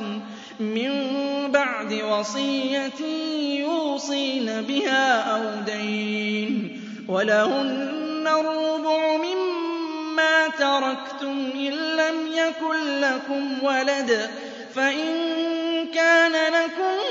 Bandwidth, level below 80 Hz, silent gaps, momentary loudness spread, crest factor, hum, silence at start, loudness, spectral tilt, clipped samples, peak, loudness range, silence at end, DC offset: 7.8 kHz; -80 dBFS; none; 9 LU; 18 dB; none; 0 s; -23 LUFS; -3.5 dB/octave; under 0.1%; -6 dBFS; 3 LU; 0 s; under 0.1%